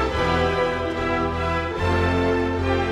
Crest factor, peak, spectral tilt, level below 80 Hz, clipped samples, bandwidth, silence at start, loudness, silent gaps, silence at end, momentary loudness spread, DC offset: 16 dB; -6 dBFS; -6.5 dB/octave; -34 dBFS; under 0.1%; 10.5 kHz; 0 s; -22 LUFS; none; 0 s; 3 LU; under 0.1%